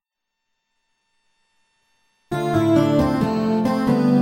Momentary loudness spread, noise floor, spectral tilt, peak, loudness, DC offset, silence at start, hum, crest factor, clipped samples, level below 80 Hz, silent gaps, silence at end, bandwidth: 6 LU; -80 dBFS; -7.5 dB/octave; -4 dBFS; -19 LUFS; under 0.1%; 2.3 s; none; 16 dB; under 0.1%; -46 dBFS; none; 0 s; 16 kHz